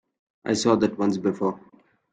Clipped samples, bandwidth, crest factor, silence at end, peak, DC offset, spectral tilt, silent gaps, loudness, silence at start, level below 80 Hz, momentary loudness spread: under 0.1%; 9.4 kHz; 20 dB; 0.55 s; -6 dBFS; under 0.1%; -5.5 dB/octave; none; -24 LUFS; 0.45 s; -64 dBFS; 12 LU